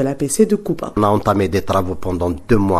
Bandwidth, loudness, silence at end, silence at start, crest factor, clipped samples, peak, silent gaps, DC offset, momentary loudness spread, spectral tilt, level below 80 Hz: 14 kHz; -18 LUFS; 0 s; 0 s; 16 dB; under 0.1%; 0 dBFS; none; under 0.1%; 6 LU; -6 dB/octave; -34 dBFS